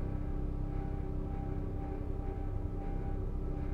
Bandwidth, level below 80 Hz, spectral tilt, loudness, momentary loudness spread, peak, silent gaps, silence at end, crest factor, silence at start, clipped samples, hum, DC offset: 3.9 kHz; -38 dBFS; -10 dB/octave; -40 LUFS; 1 LU; -24 dBFS; none; 0 s; 10 dB; 0 s; under 0.1%; none; under 0.1%